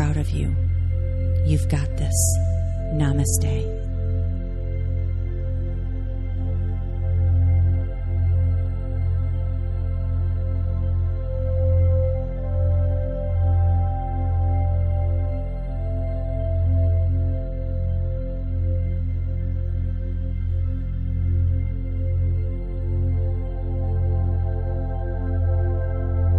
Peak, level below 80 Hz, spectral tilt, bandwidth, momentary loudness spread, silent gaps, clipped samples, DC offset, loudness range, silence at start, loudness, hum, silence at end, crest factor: -6 dBFS; -26 dBFS; -7 dB/octave; 12.5 kHz; 7 LU; none; under 0.1%; under 0.1%; 4 LU; 0 s; -24 LUFS; none; 0 s; 14 dB